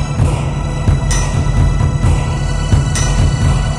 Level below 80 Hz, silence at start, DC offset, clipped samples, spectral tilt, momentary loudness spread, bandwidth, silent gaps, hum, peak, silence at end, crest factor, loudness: -18 dBFS; 0 s; under 0.1%; under 0.1%; -5.5 dB/octave; 4 LU; 12 kHz; none; none; 0 dBFS; 0 s; 12 dB; -15 LUFS